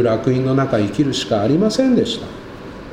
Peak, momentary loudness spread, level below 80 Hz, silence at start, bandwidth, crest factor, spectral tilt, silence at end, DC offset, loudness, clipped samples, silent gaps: -4 dBFS; 17 LU; -44 dBFS; 0 s; 11.5 kHz; 14 dB; -6 dB/octave; 0 s; under 0.1%; -17 LUFS; under 0.1%; none